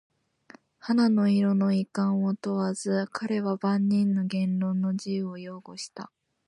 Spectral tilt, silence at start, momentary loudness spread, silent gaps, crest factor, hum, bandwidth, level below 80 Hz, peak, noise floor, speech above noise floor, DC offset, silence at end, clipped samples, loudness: -7 dB/octave; 0.85 s; 16 LU; none; 12 dB; none; 11 kHz; -74 dBFS; -14 dBFS; -55 dBFS; 29 dB; under 0.1%; 0.4 s; under 0.1%; -26 LUFS